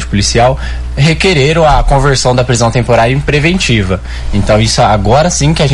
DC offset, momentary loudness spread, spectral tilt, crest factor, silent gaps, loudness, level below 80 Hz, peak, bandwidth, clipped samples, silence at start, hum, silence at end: under 0.1%; 6 LU; -5 dB/octave; 8 dB; none; -9 LUFS; -18 dBFS; 0 dBFS; 12 kHz; under 0.1%; 0 s; none; 0 s